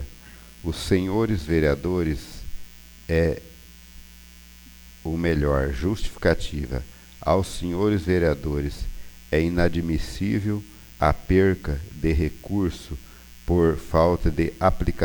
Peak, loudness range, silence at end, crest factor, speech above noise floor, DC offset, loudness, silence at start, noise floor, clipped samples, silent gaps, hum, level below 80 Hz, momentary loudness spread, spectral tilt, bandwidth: -4 dBFS; 4 LU; 0 s; 20 dB; 24 dB; under 0.1%; -24 LUFS; 0 s; -46 dBFS; under 0.1%; none; none; -34 dBFS; 17 LU; -7 dB/octave; over 20 kHz